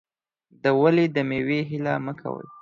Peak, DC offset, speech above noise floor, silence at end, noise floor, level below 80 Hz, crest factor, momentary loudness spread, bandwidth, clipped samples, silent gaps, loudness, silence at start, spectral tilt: -6 dBFS; under 0.1%; 40 dB; 0 s; -63 dBFS; -62 dBFS; 18 dB; 13 LU; 7.2 kHz; under 0.1%; none; -23 LUFS; 0.65 s; -8.5 dB/octave